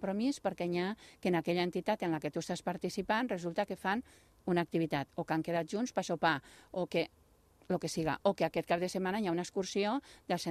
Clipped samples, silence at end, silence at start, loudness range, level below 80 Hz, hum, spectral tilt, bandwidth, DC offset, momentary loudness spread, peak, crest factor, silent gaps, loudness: under 0.1%; 0 s; 0 s; 1 LU; -68 dBFS; none; -5.5 dB/octave; 14.5 kHz; under 0.1%; 6 LU; -14 dBFS; 20 dB; none; -35 LUFS